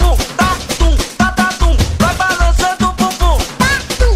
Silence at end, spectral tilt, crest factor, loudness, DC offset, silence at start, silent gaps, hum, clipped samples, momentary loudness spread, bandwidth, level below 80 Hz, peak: 0 s; -4.5 dB/octave; 10 dB; -14 LUFS; under 0.1%; 0 s; none; none; under 0.1%; 2 LU; 16 kHz; -14 dBFS; -2 dBFS